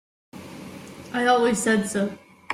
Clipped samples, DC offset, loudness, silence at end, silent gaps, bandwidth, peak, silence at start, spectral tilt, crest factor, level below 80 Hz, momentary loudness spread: under 0.1%; under 0.1%; -22 LUFS; 0 s; none; 15.5 kHz; -8 dBFS; 0.35 s; -4 dB/octave; 18 dB; -62 dBFS; 22 LU